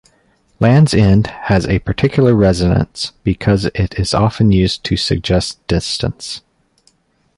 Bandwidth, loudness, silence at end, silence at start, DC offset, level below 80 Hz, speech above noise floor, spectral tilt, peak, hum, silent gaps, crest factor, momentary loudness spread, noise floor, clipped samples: 11.5 kHz; -14 LUFS; 1 s; 0.6 s; under 0.1%; -30 dBFS; 43 dB; -6.5 dB/octave; -2 dBFS; none; none; 14 dB; 9 LU; -57 dBFS; under 0.1%